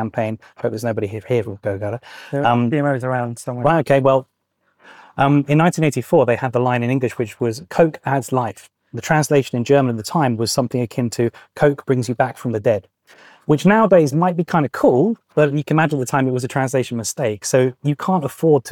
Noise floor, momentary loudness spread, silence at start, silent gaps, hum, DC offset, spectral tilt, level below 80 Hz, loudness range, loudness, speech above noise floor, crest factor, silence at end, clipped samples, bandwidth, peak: -65 dBFS; 9 LU; 0 s; none; none; under 0.1%; -6 dB/octave; -56 dBFS; 3 LU; -18 LUFS; 47 dB; 14 dB; 0 s; under 0.1%; 18.5 kHz; -4 dBFS